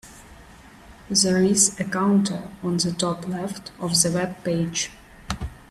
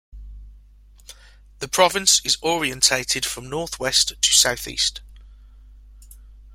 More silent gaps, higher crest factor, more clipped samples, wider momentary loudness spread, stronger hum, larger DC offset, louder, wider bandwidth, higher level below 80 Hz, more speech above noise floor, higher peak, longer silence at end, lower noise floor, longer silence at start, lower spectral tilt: neither; about the same, 20 dB vs 22 dB; neither; about the same, 14 LU vs 12 LU; second, none vs 50 Hz at -45 dBFS; neither; second, -22 LUFS vs -18 LUFS; second, 13.5 kHz vs 16.5 kHz; about the same, -48 dBFS vs -44 dBFS; second, 24 dB vs 28 dB; about the same, -4 dBFS vs -2 dBFS; first, 0.15 s vs 0 s; about the same, -47 dBFS vs -49 dBFS; about the same, 0.05 s vs 0.15 s; first, -3.5 dB/octave vs -0.5 dB/octave